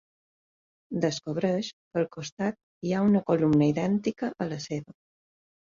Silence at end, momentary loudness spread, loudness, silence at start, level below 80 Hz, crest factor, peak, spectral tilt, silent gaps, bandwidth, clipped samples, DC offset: 0.85 s; 11 LU; -28 LUFS; 0.9 s; -64 dBFS; 16 dB; -12 dBFS; -6.5 dB/octave; 1.73-1.91 s, 2.32-2.37 s, 2.63-2.81 s; 7.6 kHz; under 0.1%; under 0.1%